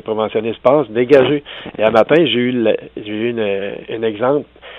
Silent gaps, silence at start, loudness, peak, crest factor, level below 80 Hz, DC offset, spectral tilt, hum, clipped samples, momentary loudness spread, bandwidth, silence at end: none; 0.05 s; -15 LUFS; 0 dBFS; 16 dB; -54 dBFS; under 0.1%; -7.5 dB/octave; none; under 0.1%; 10 LU; 6.8 kHz; 0 s